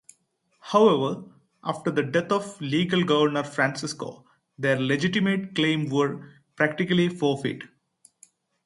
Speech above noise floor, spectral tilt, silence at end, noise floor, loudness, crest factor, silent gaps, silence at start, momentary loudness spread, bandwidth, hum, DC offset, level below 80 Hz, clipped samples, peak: 45 dB; -5.5 dB/octave; 1 s; -69 dBFS; -24 LUFS; 20 dB; none; 0.65 s; 12 LU; 11.5 kHz; none; under 0.1%; -68 dBFS; under 0.1%; -6 dBFS